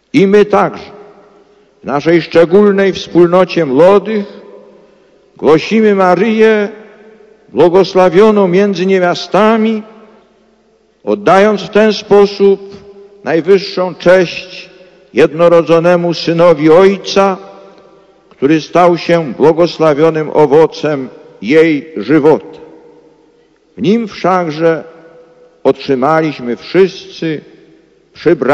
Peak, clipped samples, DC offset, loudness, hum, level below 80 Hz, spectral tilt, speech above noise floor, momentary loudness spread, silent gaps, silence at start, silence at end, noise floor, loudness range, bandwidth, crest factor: 0 dBFS; 2%; under 0.1%; -10 LUFS; none; -50 dBFS; -6.5 dB/octave; 42 dB; 12 LU; none; 0.15 s; 0 s; -51 dBFS; 4 LU; 8.8 kHz; 10 dB